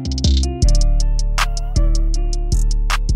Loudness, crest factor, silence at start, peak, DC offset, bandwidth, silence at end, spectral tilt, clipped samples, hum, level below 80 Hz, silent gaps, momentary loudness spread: -19 LUFS; 10 dB; 0 s; -4 dBFS; under 0.1%; 11.5 kHz; 0 s; -4.5 dB/octave; under 0.1%; none; -16 dBFS; none; 4 LU